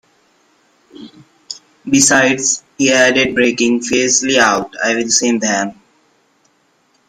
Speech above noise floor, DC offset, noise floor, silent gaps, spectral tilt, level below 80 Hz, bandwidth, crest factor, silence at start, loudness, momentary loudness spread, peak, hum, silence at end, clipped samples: 44 dB; under 0.1%; -58 dBFS; none; -2 dB/octave; -54 dBFS; 15.5 kHz; 16 dB; 0.95 s; -13 LUFS; 12 LU; 0 dBFS; none; 1.35 s; under 0.1%